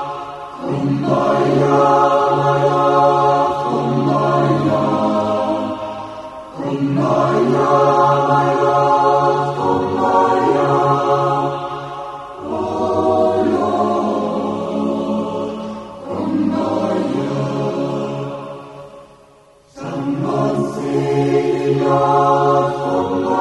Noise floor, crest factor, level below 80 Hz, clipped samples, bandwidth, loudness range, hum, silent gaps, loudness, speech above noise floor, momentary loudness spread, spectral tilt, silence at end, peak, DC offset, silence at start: -48 dBFS; 14 dB; -52 dBFS; under 0.1%; 11.5 kHz; 7 LU; none; none; -16 LUFS; 34 dB; 14 LU; -7.5 dB/octave; 0 s; -2 dBFS; under 0.1%; 0 s